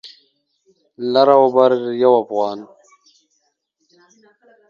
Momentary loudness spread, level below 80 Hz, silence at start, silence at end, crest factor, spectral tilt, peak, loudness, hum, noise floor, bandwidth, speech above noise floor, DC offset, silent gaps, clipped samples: 13 LU; -72 dBFS; 0.05 s; 2.05 s; 18 dB; -6.5 dB/octave; 0 dBFS; -15 LUFS; none; -68 dBFS; 7 kHz; 54 dB; under 0.1%; none; under 0.1%